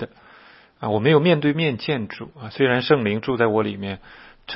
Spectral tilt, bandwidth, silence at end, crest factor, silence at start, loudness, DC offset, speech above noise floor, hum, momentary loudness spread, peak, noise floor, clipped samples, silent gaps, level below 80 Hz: -10.5 dB/octave; 5.8 kHz; 0 s; 18 dB; 0 s; -20 LUFS; under 0.1%; 28 dB; none; 18 LU; -4 dBFS; -49 dBFS; under 0.1%; none; -58 dBFS